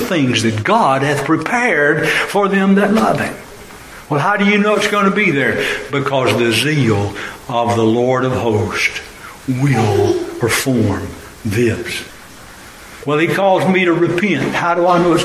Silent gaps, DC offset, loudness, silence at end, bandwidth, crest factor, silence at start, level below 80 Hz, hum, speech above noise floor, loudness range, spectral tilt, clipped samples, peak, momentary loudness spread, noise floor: none; under 0.1%; -15 LUFS; 0 s; 15.5 kHz; 14 dB; 0 s; -42 dBFS; none; 22 dB; 3 LU; -5.5 dB/octave; under 0.1%; -2 dBFS; 13 LU; -37 dBFS